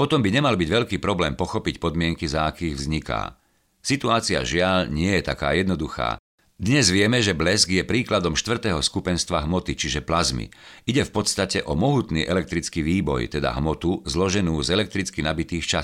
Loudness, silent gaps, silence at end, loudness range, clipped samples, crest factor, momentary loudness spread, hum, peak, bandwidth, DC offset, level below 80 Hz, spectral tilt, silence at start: -23 LUFS; 6.19-6.38 s; 0 s; 3 LU; under 0.1%; 20 dB; 7 LU; none; -4 dBFS; 15.5 kHz; under 0.1%; -40 dBFS; -4.5 dB/octave; 0 s